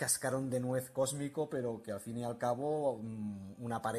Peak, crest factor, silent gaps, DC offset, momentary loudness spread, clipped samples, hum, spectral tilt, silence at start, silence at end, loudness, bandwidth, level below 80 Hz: -20 dBFS; 16 dB; none; under 0.1%; 8 LU; under 0.1%; none; -4.5 dB/octave; 0 s; 0 s; -37 LUFS; 14.5 kHz; -74 dBFS